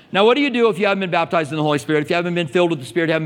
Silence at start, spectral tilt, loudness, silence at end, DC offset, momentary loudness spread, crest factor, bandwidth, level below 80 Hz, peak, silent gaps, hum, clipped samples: 0.1 s; -6 dB/octave; -18 LUFS; 0 s; under 0.1%; 5 LU; 16 dB; 15.5 kHz; -64 dBFS; -2 dBFS; none; none; under 0.1%